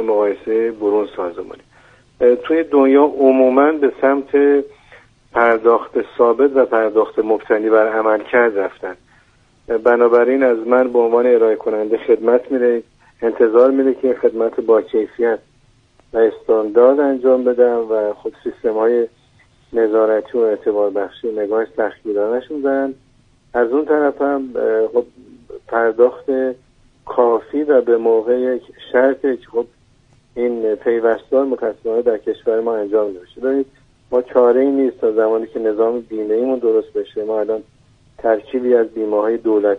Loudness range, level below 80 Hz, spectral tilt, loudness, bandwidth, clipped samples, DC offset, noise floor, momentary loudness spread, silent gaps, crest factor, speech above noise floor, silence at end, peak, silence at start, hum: 5 LU; -56 dBFS; -7.5 dB/octave; -16 LUFS; 4 kHz; under 0.1%; under 0.1%; -54 dBFS; 10 LU; none; 16 dB; 38 dB; 0 s; 0 dBFS; 0 s; none